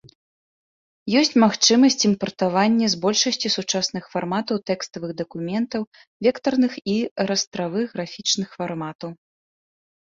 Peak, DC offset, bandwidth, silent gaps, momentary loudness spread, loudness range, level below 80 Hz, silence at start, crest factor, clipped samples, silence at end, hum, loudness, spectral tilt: -4 dBFS; under 0.1%; 7.6 kHz; 5.87-5.92 s, 6.07-6.20 s, 7.11-7.16 s, 7.47-7.51 s, 8.95-8.99 s; 14 LU; 6 LU; -64 dBFS; 1.05 s; 20 dB; under 0.1%; 0.95 s; none; -21 LUFS; -3.5 dB/octave